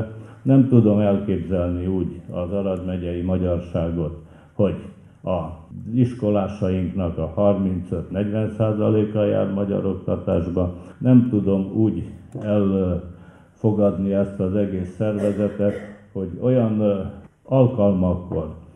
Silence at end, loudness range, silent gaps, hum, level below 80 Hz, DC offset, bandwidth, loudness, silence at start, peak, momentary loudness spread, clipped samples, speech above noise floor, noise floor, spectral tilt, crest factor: 0.15 s; 4 LU; none; none; -46 dBFS; under 0.1%; 9.2 kHz; -22 LUFS; 0 s; -2 dBFS; 12 LU; under 0.1%; 26 dB; -46 dBFS; -10.5 dB/octave; 20 dB